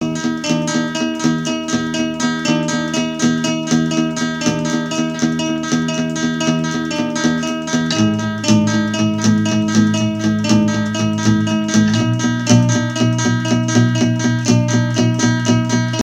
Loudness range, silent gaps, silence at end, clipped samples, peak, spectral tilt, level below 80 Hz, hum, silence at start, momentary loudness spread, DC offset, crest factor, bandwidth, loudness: 3 LU; none; 0 s; under 0.1%; 0 dBFS; -5 dB/octave; -50 dBFS; none; 0 s; 5 LU; under 0.1%; 16 dB; 11 kHz; -16 LUFS